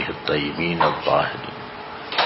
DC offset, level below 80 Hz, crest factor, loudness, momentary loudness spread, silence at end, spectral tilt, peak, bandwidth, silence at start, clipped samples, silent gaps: under 0.1%; -50 dBFS; 18 dB; -22 LUFS; 14 LU; 0 s; -8.5 dB/octave; -4 dBFS; 6 kHz; 0 s; under 0.1%; none